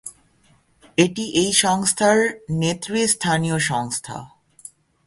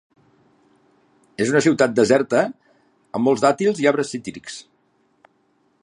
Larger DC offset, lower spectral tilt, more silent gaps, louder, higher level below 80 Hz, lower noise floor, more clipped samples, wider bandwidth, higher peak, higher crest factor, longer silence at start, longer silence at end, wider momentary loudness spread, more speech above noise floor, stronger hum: neither; second, -3.5 dB/octave vs -5 dB/octave; neither; about the same, -20 LUFS vs -19 LUFS; first, -56 dBFS vs -66 dBFS; second, -58 dBFS vs -64 dBFS; neither; about the same, 12 kHz vs 11 kHz; about the same, -2 dBFS vs -2 dBFS; about the same, 20 dB vs 20 dB; second, 0.05 s vs 1.4 s; second, 0.8 s vs 1.2 s; second, 11 LU vs 18 LU; second, 38 dB vs 45 dB; neither